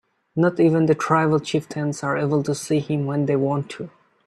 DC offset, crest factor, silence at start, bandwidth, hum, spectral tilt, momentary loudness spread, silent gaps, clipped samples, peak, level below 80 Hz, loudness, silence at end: under 0.1%; 18 dB; 0.35 s; 12.5 kHz; none; -6.5 dB/octave; 10 LU; none; under 0.1%; -2 dBFS; -62 dBFS; -21 LUFS; 0.4 s